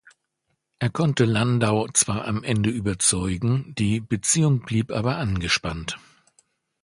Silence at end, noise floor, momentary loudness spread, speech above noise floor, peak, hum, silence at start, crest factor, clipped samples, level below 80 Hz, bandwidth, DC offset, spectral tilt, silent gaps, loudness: 0.85 s; -75 dBFS; 7 LU; 53 dB; -4 dBFS; none; 0.8 s; 20 dB; under 0.1%; -44 dBFS; 11.5 kHz; under 0.1%; -4.5 dB/octave; none; -23 LUFS